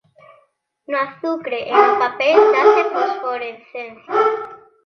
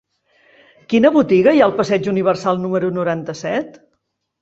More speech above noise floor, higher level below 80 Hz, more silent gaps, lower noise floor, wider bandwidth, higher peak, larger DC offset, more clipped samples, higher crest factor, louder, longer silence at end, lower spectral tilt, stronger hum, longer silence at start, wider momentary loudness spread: second, 44 dB vs 55 dB; second, -68 dBFS vs -58 dBFS; neither; second, -61 dBFS vs -71 dBFS; second, 6.4 kHz vs 8 kHz; about the same, 0 dBFS vs -2 dBFS; neither; neither; about the same, 18 dB vs 16 dB; about the same, -17 LUFS vs -16 LUFS; second, 0.3 s vs 0.7 s; second, -4 dB/octave vs -6.5 dB/octave; neither; about the same, 0.9 s vs 0.9 s; first, 17 LU vs 10 LU